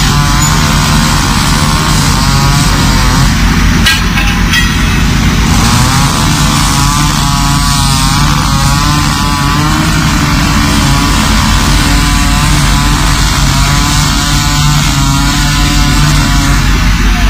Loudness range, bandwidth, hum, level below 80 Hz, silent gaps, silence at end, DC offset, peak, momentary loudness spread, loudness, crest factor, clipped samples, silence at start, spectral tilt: 1 LU; 16.5 kHz; none; -14 dBFS; none; 0 s; under 0.1%; 0 dBFS; 1 LU; -8 LUFS; 8 dB; 0.2%; 0 s; -3.5 dB/octave